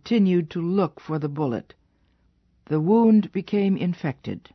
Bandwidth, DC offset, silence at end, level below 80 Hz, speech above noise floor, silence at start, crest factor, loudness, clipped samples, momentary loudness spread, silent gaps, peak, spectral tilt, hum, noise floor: 6.2 kHz; under 0.1%; 0.15 s; -62 dBFS; 42 dB; 0.05 s; 16 dB; -23 LUFS; under 0.1%; 11 LU; none; -8 dBFS; -9.5 dB/octave; none; -64 dBFS